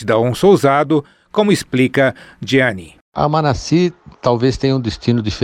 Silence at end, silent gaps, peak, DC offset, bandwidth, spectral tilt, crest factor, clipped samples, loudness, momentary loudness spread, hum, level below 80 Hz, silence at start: 0 s; 3.01-3.12 s; -2 dBFS; under 0.1%; 15.5 kHz; -6 dB/octave; 14 dB; under 0.1%; -15 LUFS; 8 LU; none; -40 dBFS; 0 s